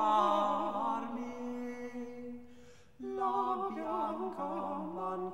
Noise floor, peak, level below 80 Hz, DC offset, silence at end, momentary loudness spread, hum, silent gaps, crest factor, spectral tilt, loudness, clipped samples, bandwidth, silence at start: -58 dBFS; -18 dBFS; -70 dBFS; 0.2%; 0 s; 14 LU; none; none; 18 dB; -6 dB/octave; -36 LUFS; under 0.1%; 16 kHz; 0 s